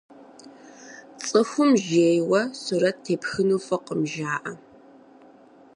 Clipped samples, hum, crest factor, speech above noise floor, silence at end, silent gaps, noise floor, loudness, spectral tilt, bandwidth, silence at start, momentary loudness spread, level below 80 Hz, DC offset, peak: under 0.1%; none; 18 dB; 29 dB; 1.2 s; none; -51 dBFS; -23 LUFS; -5 dB/octave; 10.5 kHz; 0.2 s; 18 LU; -68 dBFS; under 0.1%; -8 dBFS